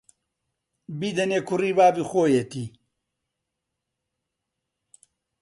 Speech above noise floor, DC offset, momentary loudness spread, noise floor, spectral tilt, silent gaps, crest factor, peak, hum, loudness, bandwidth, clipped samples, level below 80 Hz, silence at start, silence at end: 60 dB; under 0.1%; 17 LU; -83 dBFS; -5.5 dB/octave; none; 20 dB; -6 dBFS; none; -23 LUFS; 11.5 kHz; under 0.1%; -68 dBFS; 0.9 s; 2.75 s